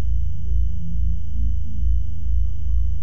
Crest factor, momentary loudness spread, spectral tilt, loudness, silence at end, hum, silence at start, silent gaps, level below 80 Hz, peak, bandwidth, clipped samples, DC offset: 10 dB; 2 LU; -9 dB/octave; -26 LUFS; 0 s; none; 0 s; none; -22 dBFS; -8 dBFS; 3.2 kHz; under 0.1%; 10%